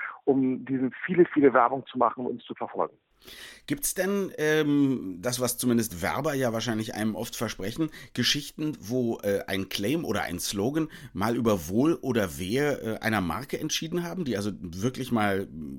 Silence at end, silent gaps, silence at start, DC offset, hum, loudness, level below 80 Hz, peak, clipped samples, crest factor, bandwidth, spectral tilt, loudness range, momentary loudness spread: 0 s; none; 0 s; under 0.1%; none; -27 LUFS; -56 dBFS; -8 dBFS; under 0.1%; 20 dB; 17.5 kHz; -4.5 dB/octave; 3 LU; 9 LU